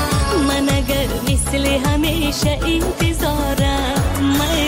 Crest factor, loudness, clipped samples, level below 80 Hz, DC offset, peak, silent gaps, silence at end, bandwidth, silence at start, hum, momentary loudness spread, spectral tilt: 10 dB; -18 LUFS; under 0.1%; -24 dBFS; under 0.1%; -6 dBFS; none; 0 s; 16.5 kHz; 0 s; none; 2 LU; -4.5 dB/octave